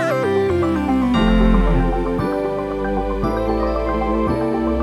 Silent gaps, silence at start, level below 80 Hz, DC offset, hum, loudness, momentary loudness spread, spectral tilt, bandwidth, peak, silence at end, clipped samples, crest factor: none; 0 s; -24 dBFS; under 0.1%; none; -19 LUFS; 6 LU; -7.5 dB/octave; 12 kHz; -4 dBFS; 0 s; under 0.1%; 14 dB